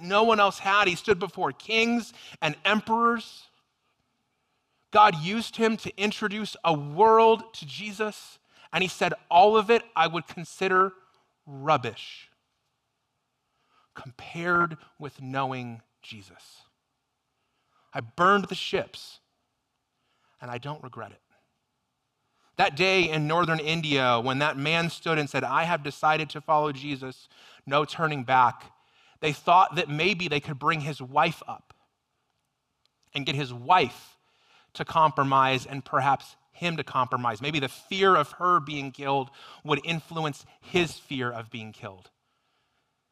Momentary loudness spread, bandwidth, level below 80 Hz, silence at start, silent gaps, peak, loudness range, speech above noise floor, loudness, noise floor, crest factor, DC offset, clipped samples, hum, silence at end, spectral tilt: 19 LU; 14.5 kHz; -66 dBFS; 0 s; none; -6 dBFS; 8 LU; 53 dB; -25 LUFS; -79 dBFS; 22 dB; under 0.1%; under 0.1%; none; 1.15 s; -5 dB/octave